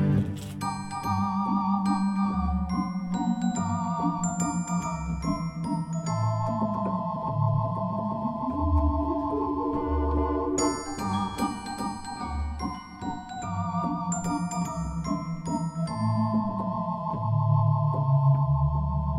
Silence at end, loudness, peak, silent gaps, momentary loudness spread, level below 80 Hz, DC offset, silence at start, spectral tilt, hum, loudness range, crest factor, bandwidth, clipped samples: 0 s; -28 LUFS; -12 dBFS; none; 8 LU; -40 dBFS; under 0.1%; 0 s; -7 dB/octave; none; 5 LU; 14 dB; 12.5 kHz; under 0.1%